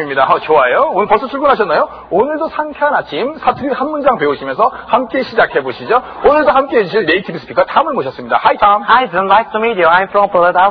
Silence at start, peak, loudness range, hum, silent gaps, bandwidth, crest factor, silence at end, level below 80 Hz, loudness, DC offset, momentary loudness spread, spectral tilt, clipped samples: 0 s; 0 dBFS; 3 LU; none; none; 5.2 kHz; 12 dB; 0 s; -44 dBFS; -13 LUFS; under 0.1%; 6 LU; -7.5 dB/octave; under 0.1%